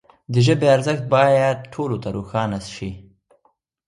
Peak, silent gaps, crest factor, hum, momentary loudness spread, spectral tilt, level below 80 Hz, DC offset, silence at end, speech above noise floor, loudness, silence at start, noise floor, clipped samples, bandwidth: -2 dBFS; none; 18 dB; none; 14 LU; -6.5 dB/octave; -50 dBFS; under 0.1%; 0.85 s; 46 dB; -19 LUFS; 0.3 s; -65 dBFS; under 0.1%; 11.5 kHz